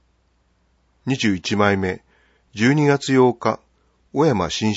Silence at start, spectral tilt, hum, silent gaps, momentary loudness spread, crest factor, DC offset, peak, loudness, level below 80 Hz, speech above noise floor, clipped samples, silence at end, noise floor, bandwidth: 1.05 s; -5.5 dB/octave; none; none; 14 LU; 20 dB; under 0.1%; -2 dBFS; -19 LUFS; -54 dBFS; 45 dB; under 0.1%; 0 s; -63 dBFS; 8 kHz